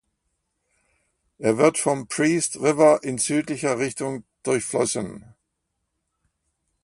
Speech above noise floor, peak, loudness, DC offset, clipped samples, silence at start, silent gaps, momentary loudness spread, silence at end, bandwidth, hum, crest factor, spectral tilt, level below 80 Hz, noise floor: 56 dB; -4 dBFS; -22 LUFS; under 0.1%; under 0.1%; 1.4 s; none; 12 LU; 1.65 s; 11.5 kHz; none; 22 dB; -4.5 dB/octave; -64 dBFS; -78 dBFS